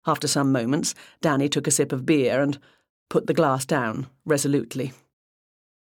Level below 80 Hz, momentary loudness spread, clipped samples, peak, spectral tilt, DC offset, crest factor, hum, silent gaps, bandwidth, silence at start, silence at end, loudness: -68 dBFS; 9 LU; under 0.1%; -8 dBFS; -4.5 dB/octave; under 0.1%; 18 dB; none; 2.90-3.06 s; 17.5 kHz; 0.05 s; 1 s; -23 LUFS